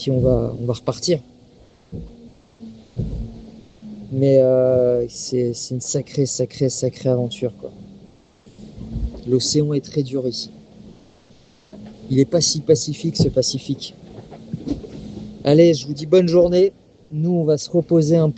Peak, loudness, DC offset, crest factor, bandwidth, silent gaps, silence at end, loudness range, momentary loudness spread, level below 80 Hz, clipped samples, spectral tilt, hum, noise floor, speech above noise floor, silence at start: -2 dBFS; -19 LUFS; under 0.1%; 18 dB; 8.8 kHz; none; 0 s; 7 LU; 21 LU; -40 dBFS; under 0.1%; -6 dB/octave; none; -52 dBFS; 34 dB; 0 s